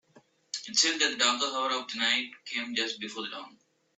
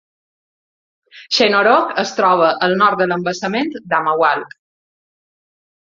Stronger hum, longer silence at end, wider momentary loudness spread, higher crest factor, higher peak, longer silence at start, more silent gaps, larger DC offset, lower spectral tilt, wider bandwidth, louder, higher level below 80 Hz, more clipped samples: neither; second, 0.5 s vs 1.45 s; first, 14 LU vs 7 LU; first, 22 dB vs 16 dB; second, -10 dBFS vs -2 dBFS; second, 0.15 s vs 1.15 s; neither; neither; second, 0.5 dB/octave vs -4 dB/octave; first, 8.4 kHz vs 7.6 kHz; second, -28 LUFS vs -15 LUFS; second, -82 dBFS vs -64 dBFS; neither